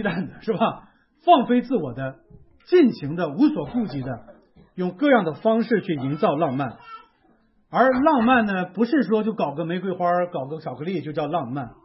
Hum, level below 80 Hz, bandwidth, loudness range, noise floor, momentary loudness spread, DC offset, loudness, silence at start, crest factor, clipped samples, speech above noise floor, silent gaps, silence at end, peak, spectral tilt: none; -58 dBFS; 5.8 kHz; 3 LU; -61 dBFS; 13 LU; under 0.1%; -22 LUFS; 0 s; 18 dB; under 0.1%; 39 dB; none; 0.1 s; -4 dBFS; -11 dB/octave